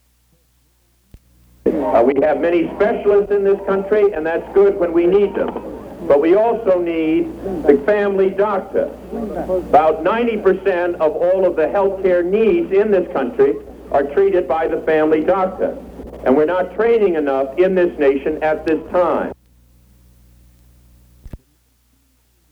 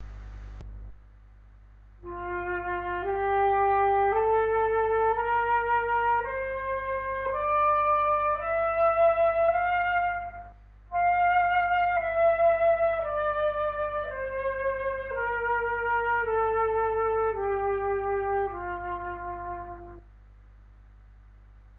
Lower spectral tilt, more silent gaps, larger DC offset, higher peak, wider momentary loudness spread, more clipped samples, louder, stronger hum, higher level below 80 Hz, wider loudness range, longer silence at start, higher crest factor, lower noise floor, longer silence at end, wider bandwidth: about the same, -8 dB/octave vs -8 dB/octave; neither; neither; first, 0 dBFS vs -14 dBFS; second, 8 LU vs 13 LU; neither; first, -16 LUFS vs -26 LUFS; about the same, 60 Hz at -45 dBFS vs 50 Hz at -50 dBFS; about the same, -44 dBFS vs -48 dBFS; second, 3 LU vs 7 LU; first, 1.65 s vs 0 s; about the same, 16 dB vs 14 dB; first, -58 dBFS vs -52 dBFS; about the same, 1.15 s vs 1.05 s; first, 5.6 kHz vs 4.2 kHz